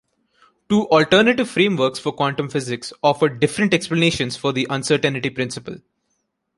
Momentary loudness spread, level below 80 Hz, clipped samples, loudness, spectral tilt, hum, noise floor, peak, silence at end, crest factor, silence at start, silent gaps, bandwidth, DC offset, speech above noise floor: 11 LU; -54 dBFS; under 0.1%; -19 LUFS; -5 dB/octave; none; -72 dBFS; 0 dBFS; 0.8 s; 20 dB; 0.7 s; none; 11.5 kHz; under 0.1%; 53 dB